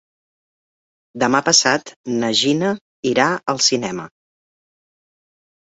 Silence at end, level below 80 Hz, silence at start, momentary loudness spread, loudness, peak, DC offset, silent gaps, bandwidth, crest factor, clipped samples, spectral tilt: 1.7 s; -62 dBFS; 1.15 s; 11 LU; -17 LUFS; -2 dBFS; under 0.1%; 1.96-2.04 s, 2.81-3.03 s; 8.2 kHz; 20 dB; under 0.1%; -2.5 dB/octave